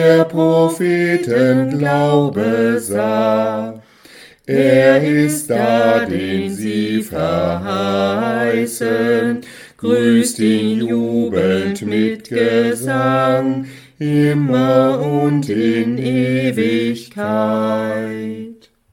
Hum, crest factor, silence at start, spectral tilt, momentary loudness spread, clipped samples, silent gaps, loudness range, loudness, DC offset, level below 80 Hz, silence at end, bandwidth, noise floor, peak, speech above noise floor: none; 16 dB; 0 s; -6 dB/octave; 8 LU; under 0.1%; none; 3 LU; -16 LUFS; under 0.1%; -54 dBFS; 0.4 s; 17 kHz; -43 dBFS; 0 dBFS; 28 dB